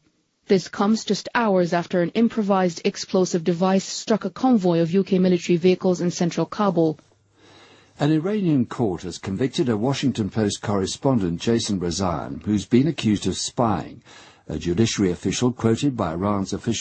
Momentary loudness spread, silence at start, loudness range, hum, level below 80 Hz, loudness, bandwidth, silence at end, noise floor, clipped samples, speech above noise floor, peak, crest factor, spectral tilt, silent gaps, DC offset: 6 LU; 0.5 s; 3 LU; none; -52 dBFS; -22 LUFS; 8.8 kHz; 0 s; -54 dBFS; under 0.1%; 33 dB; -4 dBFS; 18 dB; -5.5 dB/octave; none; under 0.1%